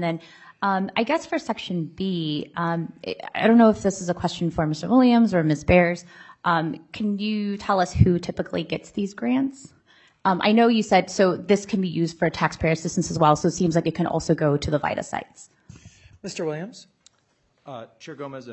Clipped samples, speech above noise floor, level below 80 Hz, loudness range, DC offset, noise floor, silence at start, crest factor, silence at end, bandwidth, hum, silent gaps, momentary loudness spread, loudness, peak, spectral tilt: under 0.1%; 44 dB; -48 dBFS; 7 LU; under 0.1%; -67 dBFS; 0 s; 20 dB; 0 s; 8.4 kHz; none; none; 14 LU; -23 LUFS; -2 dBFS; -6 dB/octave